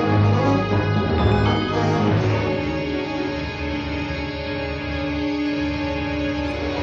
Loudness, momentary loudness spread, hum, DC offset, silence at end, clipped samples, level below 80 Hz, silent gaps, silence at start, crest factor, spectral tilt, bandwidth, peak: -22 LUFS; 8 LU; none; under 0.1%; 0 s; under 0.1%; -34 dBFS; none; 0 s; 16 dB; -7.5 dB/octave; 7.2 kHz; -6 dBFS